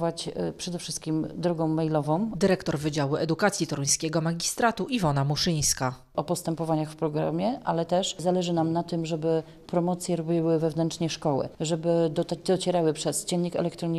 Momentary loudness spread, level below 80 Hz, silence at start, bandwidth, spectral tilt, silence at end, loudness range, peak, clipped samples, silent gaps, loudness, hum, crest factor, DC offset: 5 LU; -54 dBFS; 0 s; 13.5 kHz; -5 dB/octave; 0 s; 2 LU; -8 dBFS; under 0.1%; none; -27 LUFS; none; 18 dB; under 0.1%